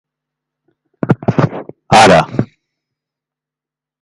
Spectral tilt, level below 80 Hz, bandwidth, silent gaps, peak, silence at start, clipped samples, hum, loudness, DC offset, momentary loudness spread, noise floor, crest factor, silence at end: -5 dB/octave; -44 dBFS; 11.5 kHz; none; 0 dBFS; 1.05 s; under 0.1%; none; -11 LUFS; under 0.1%; 19 LU; -87 dBFS; 16 dB; 1.55 s